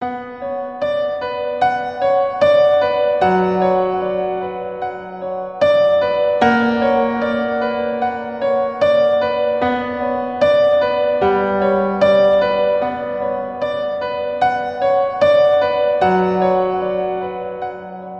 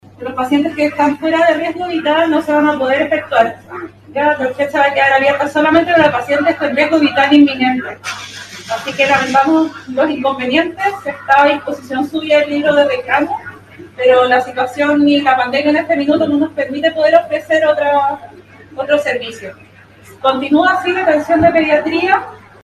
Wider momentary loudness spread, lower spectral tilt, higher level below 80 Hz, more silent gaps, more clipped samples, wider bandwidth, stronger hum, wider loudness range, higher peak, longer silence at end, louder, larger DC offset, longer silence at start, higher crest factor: about the same, 12 LU vs 12 LU; first, -7 dB/octave vs -5 dB/octave; about the same, -52 dBFS vs -52 dBFS; neither; neither; second, 6.6 kHz vs 13 kHz; neither; about the same, 2 LU vs 3 LU; about the same, -2 dBFS vs 0 dBFS; second, 0 s vs 0.25 s; second, -17 LUFS vs -13 LUFS; first, 0.1% vs under 0.1%; second, 0 s vs 0.2 s; about the same, 16 dB vs 14 dB